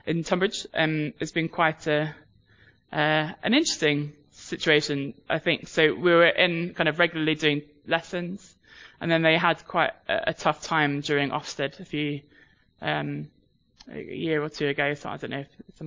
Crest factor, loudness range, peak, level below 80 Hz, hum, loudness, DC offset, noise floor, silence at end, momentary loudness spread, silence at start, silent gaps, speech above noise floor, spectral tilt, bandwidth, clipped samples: 20 dB; 7 LU; -6 dBFS; -62 dBFS; none; -25 LUFS; under 0.1%; -59 dBFS; 0 s; 13 LU; 0.05 s; none; 33 dB; -4.5 dB/octave; 7.6 kHz; under 0.1%